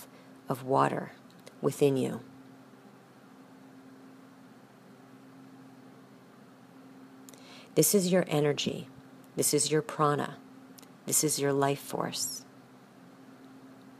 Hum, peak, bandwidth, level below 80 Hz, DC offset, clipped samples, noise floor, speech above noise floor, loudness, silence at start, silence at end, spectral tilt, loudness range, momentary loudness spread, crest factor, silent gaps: none; -10 dBFS; 15.5 kHz; -78 dBFS; under 0.1%; under 0.1%; -55 dBFS; 26 dB; -29 LUFS; 0 s; 0.1 s; -4 dB/octave; 7 LU; 26 LU; 22 dB; none